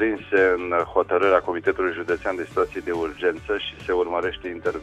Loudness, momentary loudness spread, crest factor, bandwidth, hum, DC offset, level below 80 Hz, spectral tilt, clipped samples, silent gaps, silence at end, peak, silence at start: -23 LUFS; 8 LU; 20 dB; 9.6 kHz; none; under 0.1%; -50 dBFS; -5.5 dB/octave; under 0.1%; none; 0 s; -4 dBFS; 0 s